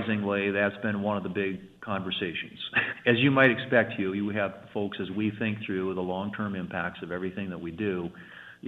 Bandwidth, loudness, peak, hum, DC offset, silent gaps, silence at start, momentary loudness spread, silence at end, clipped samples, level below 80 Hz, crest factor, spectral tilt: 4.8 kHz; -28 LUFS; -6 dBFS; none; under 0.1%; none; 0 s; 12 LU; 0 s; under 0.1%; -66 dBFS; 22 dB; -8 dB/octave